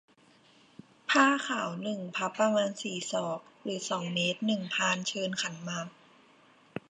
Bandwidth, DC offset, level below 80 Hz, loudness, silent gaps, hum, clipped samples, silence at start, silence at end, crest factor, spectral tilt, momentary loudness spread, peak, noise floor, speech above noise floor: 10.5 kHz; under 0.1%; -80 dBFS; -30 LUFS; none; none; under 0.1%; 1.1 s; 0.1 s; 22 dB; -3.5 dB/octave; 13 LU; -10 dBFS; -62 dBFS; 31 dB